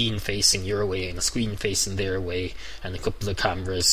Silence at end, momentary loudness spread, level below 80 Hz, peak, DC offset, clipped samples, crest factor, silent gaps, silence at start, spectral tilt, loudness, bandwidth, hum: 0 s; 11 LU; -40 dBFS; -6 dBFS; 1%; under 0.1%; 20 dB; none; 0 s; -3 dB/octave; -25 LUFS; 16 kHz; none